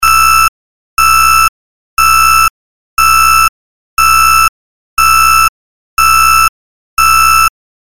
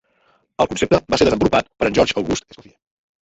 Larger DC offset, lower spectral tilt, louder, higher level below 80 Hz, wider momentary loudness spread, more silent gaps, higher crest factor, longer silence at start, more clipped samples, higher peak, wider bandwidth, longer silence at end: first, 8% vs under 0.1%; second, 0.5 dB/octave vs -5 dB/octave; first, -7 LUFS vs -18 LUFS; first, -30 dBFS vs -42 dBFS; about the same, 9 LU vs 8 LU; first, 0.48-0.97 s, 1.49-1.97 s, 2.50-2.97 s, 3.49-3.97 s, 4.49-4.97 s, 5.49-5.97 s, 6.49-6.97 s vs none; second, 10 dB vs 18 dB; second, 0 s vs 0.6 s; neither; about the same, 0 dBFS vs -2 dBFS; first, 17 kHz vs 8.2 kHz; second, 0.4 s vs 0.85 s